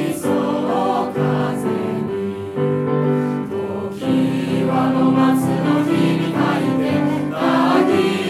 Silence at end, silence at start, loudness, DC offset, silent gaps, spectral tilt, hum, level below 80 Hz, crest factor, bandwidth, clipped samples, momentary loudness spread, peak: 0 s; 0 s; -18 LUFS; under 0.1%; none; -7 dB/octave; none; -58 dBFS; 14 dB; 14 kHz; under 0.1%; 8 LU; -4 dBFS